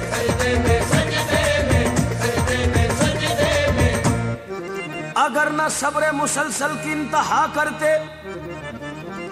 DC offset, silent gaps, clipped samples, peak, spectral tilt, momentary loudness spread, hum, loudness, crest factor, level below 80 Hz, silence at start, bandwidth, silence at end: under 0.1%; none; under 0.1%; -4 dBFS; -4.5 dB/octave; 13 LU; none; -20 LUFS; 16 dB; -34 dBFS; 0 s; 15 kHz; 0 s